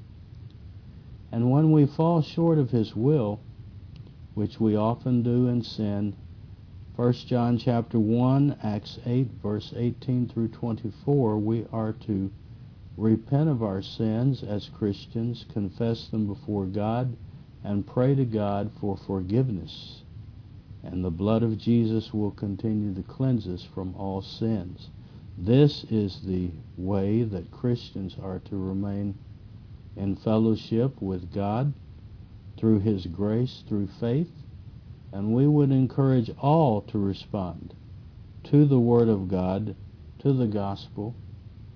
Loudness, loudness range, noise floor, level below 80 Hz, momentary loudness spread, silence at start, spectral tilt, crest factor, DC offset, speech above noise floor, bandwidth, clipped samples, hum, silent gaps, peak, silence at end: -26 LUFS; 5 LU; -45 dBFS; -52 dBFS; 23 LU; 0 s; -10 dB/octave; 20 dB; under 0.1%; 20 dB; 5.4 kHz; under 0.1%; none; none; -6 dBFS; 0.05 s